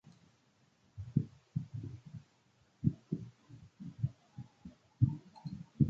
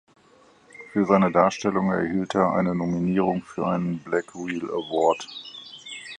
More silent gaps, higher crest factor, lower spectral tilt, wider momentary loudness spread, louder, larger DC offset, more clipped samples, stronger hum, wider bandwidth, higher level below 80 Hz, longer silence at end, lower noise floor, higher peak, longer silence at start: neither; about the same, 24 dB vs 20 dB; first, -11 dB/octave vs -6.5 dB/octave; first, 21 LU vs 17 LU; second, -39 LUFS vs -24 LUFS; neither; neither; neither; second, 7.2 kHz vs 9.8 kHz; about the same, -58 dBFS vs -58 dBFS; about the same, 0 s vs 0 s; first, -71 dBFS vs -56 dBFS; second, -14 dBFS vs -4 dBFS; first, 0.95 s vs 0.8 s